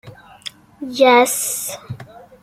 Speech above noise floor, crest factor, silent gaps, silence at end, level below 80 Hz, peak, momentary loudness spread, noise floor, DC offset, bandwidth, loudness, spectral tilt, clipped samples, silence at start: 22 dB; 18 dB; none; 0.25 s; -60 dBFS; -2 dBFS; 22 LU; -38 dBFS; under 0.1%; 16 kHz; -15 LUFS; -2.5 dB/octave; under 0.1%; 0.05 s